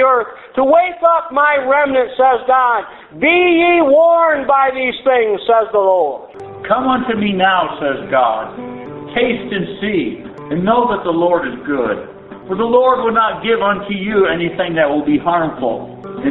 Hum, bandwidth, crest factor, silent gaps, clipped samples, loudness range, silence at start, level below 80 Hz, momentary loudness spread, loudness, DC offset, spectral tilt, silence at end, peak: none; 4.1 kHz; 14 dB; none; under 0.1%; 5 LU; 0 s; -50 dBFS; 12 LU; -14 LUFS; under 0.1%; -3 dB/octave; 0 s; 0 dBFS